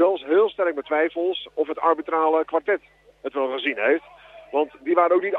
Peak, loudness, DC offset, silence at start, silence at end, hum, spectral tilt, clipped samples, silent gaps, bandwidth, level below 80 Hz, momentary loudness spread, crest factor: -6 dBFS; -23 LUFS; under 0.1%; 0 s; 0 s; none; -6 dB/octave; under 0.1%; none; 4.1 kHz; -68 dBFS; 8 LU; 16 dB